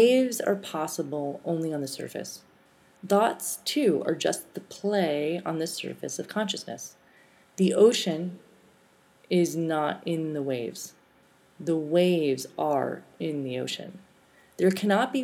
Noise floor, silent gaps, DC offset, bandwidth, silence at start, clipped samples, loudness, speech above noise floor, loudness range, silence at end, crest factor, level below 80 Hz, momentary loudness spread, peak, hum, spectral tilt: -61 dBFS; none; under 0.1%; 17 kHz; 0 s; under 0.1%; -27 LUFS; 34 dB; 3 LU; 0 s; 20 dB; -80 dBFS; 14 LU; -8 dBFS; none; -5 dB/octave